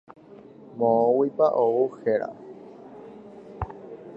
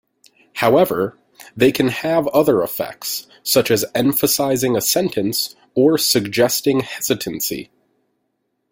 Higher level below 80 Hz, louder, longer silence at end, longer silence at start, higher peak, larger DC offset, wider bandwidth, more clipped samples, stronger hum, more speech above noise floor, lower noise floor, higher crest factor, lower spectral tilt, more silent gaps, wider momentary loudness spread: about the same, -54 dBFS vs -56 dBFS; second, -23 LUFS vs -18 LUFS; second, 0 s vs 1.1 s; first, 0.7 s vs 0.55 s; second, -8 dBFS vs -2 dBFS; neither; second, 5.6 kHz vs 17 kHz; neither; neither; second, 25 dB vs 54 dB; second, -47 dBFS vs -71 dBFS; about the same, 18 dB vs 18 dB; first, -9.5 dB/octave vs -3.5 dB/octave; neither; first, 24 LU vs 9 LU